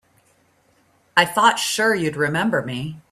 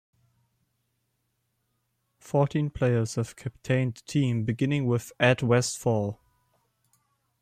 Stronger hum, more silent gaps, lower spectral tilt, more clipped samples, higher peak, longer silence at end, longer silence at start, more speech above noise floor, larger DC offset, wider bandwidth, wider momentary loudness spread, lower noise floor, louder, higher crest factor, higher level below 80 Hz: neither; neither; second, -3.5 dB/octave vs -6 dB/octave; neither; first, 0 dBFS vs -8 dBFS; second, 0.1 s vs 1.25 s; second, 1.15 s vs 2.25 s; second, 40 dB vs 51 dB; neither; about the same, 16 kHz vs 15 kHz; about the same, 8 LU vs 9 LU; second, -60 dBFS vs -76 dBFS; first, -19 LUFS vs -27 LUFS; about the same, 20 dB vs 20 dB; about the same, -62 dBFS vs -58 dBFS